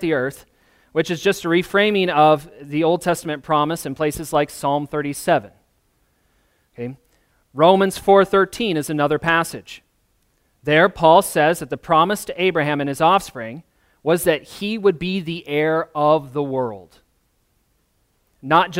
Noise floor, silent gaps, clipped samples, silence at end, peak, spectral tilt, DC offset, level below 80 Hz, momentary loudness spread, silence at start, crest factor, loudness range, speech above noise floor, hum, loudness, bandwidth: -65 dBFS; none; under 0.1%; 0 s; 0 dBFS; -5 dB/octave; under 0.1%; -52 dBFS; 14 LU; 0 s; 20 dB; 5 LU; 46 dB; none; -19 LUFS; 16 kHz